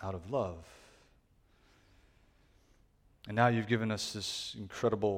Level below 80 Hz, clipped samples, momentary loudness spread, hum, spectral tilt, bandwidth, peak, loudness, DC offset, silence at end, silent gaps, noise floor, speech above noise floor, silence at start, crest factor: -64 dBFS; under 0.1%; 17 LU; none; -5 dB/octave; 16 kHz; -12 dBFS; -34 LUFS; under 0.1%; 0 s; none; -68 dBFS; 34 dB; 0 s; 24 dB